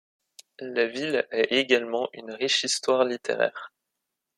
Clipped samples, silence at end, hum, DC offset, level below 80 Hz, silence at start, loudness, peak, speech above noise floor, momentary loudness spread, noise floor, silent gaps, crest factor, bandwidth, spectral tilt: under 0.1%; 0.7 s; none; under 0.1%; -76 dBFS; 0.6 s; -25 LUFS; -6 dBFS; 57 dB; 10 LU; -83 dBFS; none; 20 dB; 13 kHz; -2 dB/octave